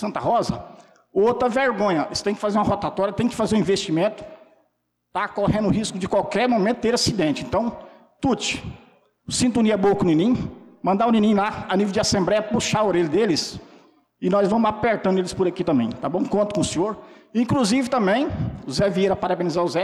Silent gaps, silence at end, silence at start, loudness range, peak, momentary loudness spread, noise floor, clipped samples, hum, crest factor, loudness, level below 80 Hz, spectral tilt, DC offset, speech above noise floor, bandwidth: none; 0 s; 0 s; 3 LU; -12 dBFS; 8 LU; -72 dBFS; under 0.1%; none; 10 dB; -22 LUFS; -48 dBFS; -5 dB/octave; under 0.1%; 51 dB; 13 kHz